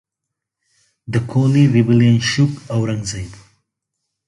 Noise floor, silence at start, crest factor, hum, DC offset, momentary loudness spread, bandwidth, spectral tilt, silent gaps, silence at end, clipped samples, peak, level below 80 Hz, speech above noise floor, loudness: -81 dBFS; 1.1 s; 16 dB; none; under 0.1%; 12 LU; 11.5 kHz; -6.5 dB/octave; none; 0.95 s; under 0.1%; -2 dBFS; -46 dBFS; 66 dB; -16 LUFS